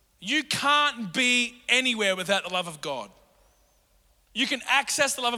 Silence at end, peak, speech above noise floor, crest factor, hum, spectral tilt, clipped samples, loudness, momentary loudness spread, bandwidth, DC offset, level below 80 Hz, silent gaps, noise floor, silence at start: 0 s; -6 dBFS; 38 dB; 22 dB; none; -1.5 dB/octave; under 0.1%; -24 LUFS; 12 LU; 18.5 kHz; under 0.1%; -66 dBFS; none; -64 dBFS; 0.2 s